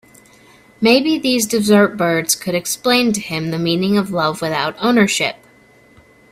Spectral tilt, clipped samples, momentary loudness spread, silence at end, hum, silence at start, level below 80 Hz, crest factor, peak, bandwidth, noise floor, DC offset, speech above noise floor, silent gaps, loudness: -4 dB/octave; under 0.1%; 7 LU; 1 s; none; 0.8 s; -56 dBFS; 18 dB; 0 dBFS; 16 kHz; -49 dBFS; under 0.1%; 33 dB; none; -16 LUFS